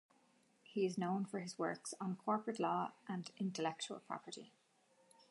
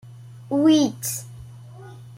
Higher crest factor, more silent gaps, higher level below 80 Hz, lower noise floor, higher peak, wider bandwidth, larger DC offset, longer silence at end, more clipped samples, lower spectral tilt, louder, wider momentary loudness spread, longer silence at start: about the same, 18 dB vs 16 dB; neither; second, under -90 dBFS vs -58 dBFS; first, -74 dBFS vs -41 dBFS; second, -24 dBFS vs -8 dBFS; second, 11.5 kHz vs 16.5 kHz; neither; first, 0.8 s vs 0 s; neither; about the same, -5 dB/octave vs -5 dB/octave; second, -42 LUFS vs -21 LUFS; second, 9 LU vs 25 LU; first, 0.7 s vs 0.05 s